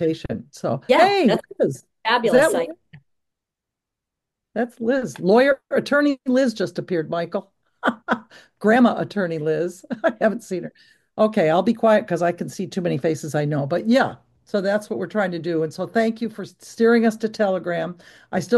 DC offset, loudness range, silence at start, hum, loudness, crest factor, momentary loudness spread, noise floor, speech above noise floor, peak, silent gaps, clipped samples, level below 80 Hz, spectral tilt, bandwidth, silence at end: under 0.1%; 3 LU; 0 s; none; -21 LUFS; 18 dB; 12 LU; -85 dBFS; 64 dB; -2 dBFS; none; under 0.1%; -60 dBFS; -6 dB/octave; 12.5 kHz; 0 s